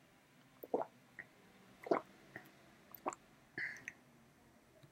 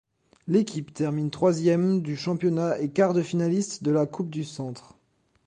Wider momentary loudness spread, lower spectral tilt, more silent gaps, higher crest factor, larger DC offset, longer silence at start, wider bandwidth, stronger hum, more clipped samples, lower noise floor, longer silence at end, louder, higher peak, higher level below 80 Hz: first, 26 LU vs 11 LU; second, -4.5 dB/octave vs -7 dB/octave; neither; first, 28 dB vs 18 dB; neither; first, 0.6 s vs 0.45 s; first, 16 kHz vs 9.8 kHz; neither; neither; about the same, -67 dBFS vs -68 dBFS; second, 0.05 s vs 0.65 s; second, -45 LUFS vs -25 LUFS; second, -20 dBFS vs -8 dBFS; second, -84 dBFS vs -66 dBFS